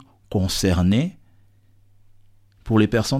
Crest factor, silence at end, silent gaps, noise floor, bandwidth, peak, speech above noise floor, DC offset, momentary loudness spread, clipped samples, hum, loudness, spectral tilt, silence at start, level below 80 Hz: 18 dB; 0 s; none; -54 dBFS; 16 kHz; -4 dBFS; 35 dB; under 0.1%; 8 LU; under 0.1%; none; -21 LUFS; -5.5 dB/octave; 0.3 s; -40 dBFS